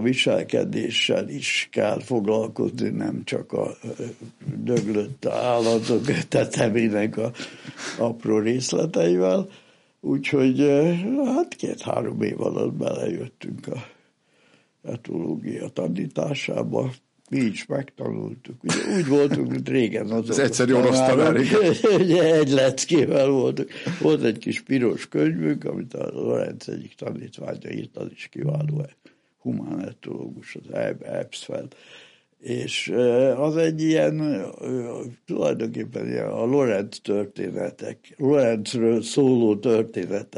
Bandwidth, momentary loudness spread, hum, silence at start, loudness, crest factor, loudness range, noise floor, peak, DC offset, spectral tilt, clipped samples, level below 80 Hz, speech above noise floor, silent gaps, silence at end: 11.5 kHz; 15 LU; none; 0 s; -23 LUFS; 18 dB; 11 LU; -62 dBFS; -6 dBFS; under 0.1%; -5.5 dB/octave; under 0.1%; -68 dBFS; 39 dB; none; 0 s